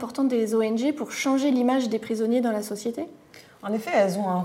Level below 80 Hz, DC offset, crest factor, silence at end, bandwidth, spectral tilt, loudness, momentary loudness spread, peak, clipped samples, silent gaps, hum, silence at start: -72 dBFS; under 0.1%; 14 dB; 0 s; 16 kHz; -5.5 dB/octave; -25 LUFS; 9 LU; -10 dBFS; under 0.1%; none; none; 0 s